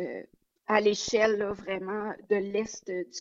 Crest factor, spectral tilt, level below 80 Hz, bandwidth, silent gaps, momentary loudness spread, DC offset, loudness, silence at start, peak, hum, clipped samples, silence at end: 22 dB; -3.5 dB/octave; -66 dBFS; 7.8 kHz; none; 11 LU; under 0.1%; -29 LUFS; 0 s; -8 dBFS; none; under 0.1%; 0 s